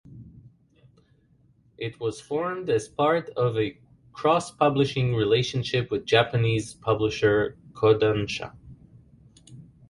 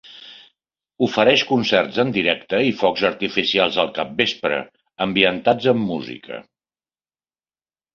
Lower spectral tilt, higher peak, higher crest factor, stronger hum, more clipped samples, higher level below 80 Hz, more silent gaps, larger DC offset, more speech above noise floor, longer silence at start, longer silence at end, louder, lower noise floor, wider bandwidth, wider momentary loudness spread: about the same, -6 dB/octave vs -5 dB/octave; second, -4 dBFS vs 0 dBFS; about the same, 22 dB vs 20 dB; neither; neither; about the same, -54 dBFS vs -58 dBFS; neither; neither; second, 37 dB vs over 71 dB; about the same, 0.1 s vs 0.1 s; second, 0.25 s vs 1.55 s; second, -25 LUFS vs -19 LUFS; second, -61 dBFS vs under -90 dBFS; first, 11.5 kHz vs 7.2 kHz; second, 10 LU vs 16 LU